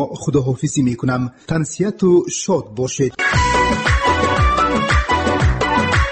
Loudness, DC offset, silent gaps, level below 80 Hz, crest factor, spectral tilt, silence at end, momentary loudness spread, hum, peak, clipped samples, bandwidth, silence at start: -17 LUFS; under 0.1%; none; -26 dBFS; 12 dB; -5 dB/octave; 0 s; 6 LU; none; -4 dBFS; under 0.1%; 8.8 kHz; 0 s